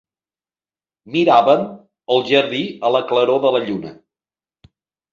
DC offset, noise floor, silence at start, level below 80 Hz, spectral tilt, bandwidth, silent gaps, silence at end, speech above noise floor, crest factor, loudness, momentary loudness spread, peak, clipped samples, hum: under 0.1%; under -90 dBFS; 1.05 s; -64 dBFS; -6 dB/octave; 7.4 kHz; none; 1.2 s; over 74 dB; 18 dB; -17 LUFS; 15 LU; -2 dBFS; under 0.1%; none